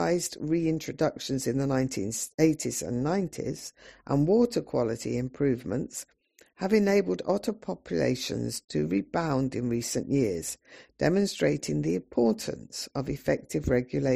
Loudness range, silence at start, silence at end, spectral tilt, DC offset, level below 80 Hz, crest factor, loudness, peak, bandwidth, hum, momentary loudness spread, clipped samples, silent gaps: 1 LU; 0 s; 0 s; -5.5 dB/octave; under 0.1%; -52 dBFS; 18 dB; -28 LUFS; -10 dBFS; 15 kHz; none; 10 LU; under 0.1%; 2.34-2.38 s, 8.64-8.68 s